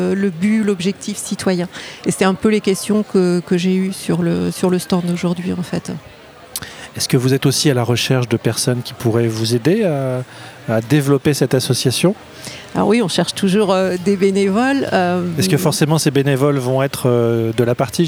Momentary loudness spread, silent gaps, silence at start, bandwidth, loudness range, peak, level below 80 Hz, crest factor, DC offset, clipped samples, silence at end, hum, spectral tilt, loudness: 9 LU; none; 0 s; over 20 kHz; 3 LU; -2 dBFS; -54 dBFS; 16 dB; under 0.1%; under 0.1%; 0 s; none; -5.5 dB/octave; -17 LUFS